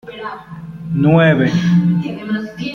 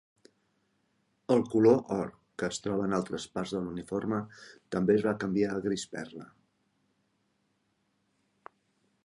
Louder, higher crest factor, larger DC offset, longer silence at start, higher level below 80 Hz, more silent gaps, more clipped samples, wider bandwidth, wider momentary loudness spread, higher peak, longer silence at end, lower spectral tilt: first, -15 LUFS vs -30 LUFS; second, 14 dB vs 22 dB; neither; second, 0.05 s vs 1.3 s; first, -48 dBFS vs -66 dBFS; neither; neither; second, 6.8 kHz vs 11.5 kHz; first, 19 LU vs 16 LU; first, -2 dBFS vs -12 dBFS; second, 0 s vs 2.8 s; first, -8 dB/octave vs -6 dB/octave